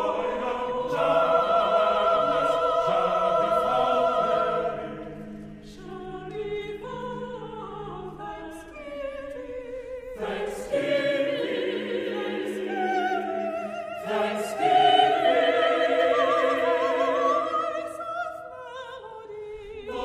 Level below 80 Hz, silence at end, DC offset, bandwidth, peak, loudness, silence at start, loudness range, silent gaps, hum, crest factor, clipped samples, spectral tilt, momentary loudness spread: -56 dBFS; 0 s; under 0.1%; 13.5 kHz; -8 dBFS; -25 LUFS; 0 s; 14 LU; none; none; 18 dB; under 0.1%; -4.5 dB/octave; 17 LU